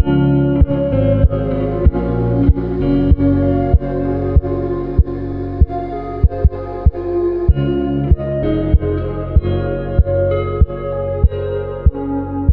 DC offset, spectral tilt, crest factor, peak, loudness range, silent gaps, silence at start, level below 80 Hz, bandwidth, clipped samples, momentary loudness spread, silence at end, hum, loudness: under 0.1%; -12 dB/octave; 14 dB; 0 dBFS; 3 LU; none; 0 s; -20 dBFS; 4.3 kHz; under 0.1%; 6 LU; 0 s; none; -17 LUFS